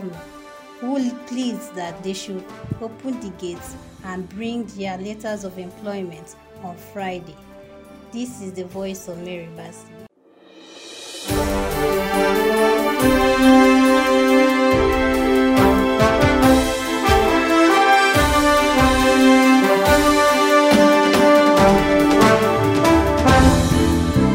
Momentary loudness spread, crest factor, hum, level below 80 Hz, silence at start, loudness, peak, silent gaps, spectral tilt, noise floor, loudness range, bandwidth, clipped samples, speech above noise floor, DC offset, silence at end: 19 LU; 16 dB; none; -34 dBFS; 0 s; -15 LUFS; -2 dBFS; none; -5 dB/octave; -50 dBFS; 18 LU; 16 kHz; under 0.1%; 21 dB; under 0.1%; 0 s